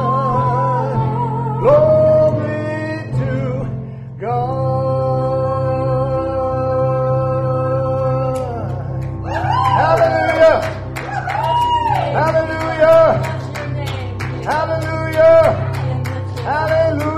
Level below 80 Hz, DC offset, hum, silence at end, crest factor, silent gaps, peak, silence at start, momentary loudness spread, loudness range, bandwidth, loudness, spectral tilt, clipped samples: -38 dBFS; under 0.1%; none; 0 s; 14 dB; none; -2 dBFS; 0 s; 12 LU; 4 LU; 13.5 kHz; -16 LUFS; -7.5 dB/octave; under 0.1%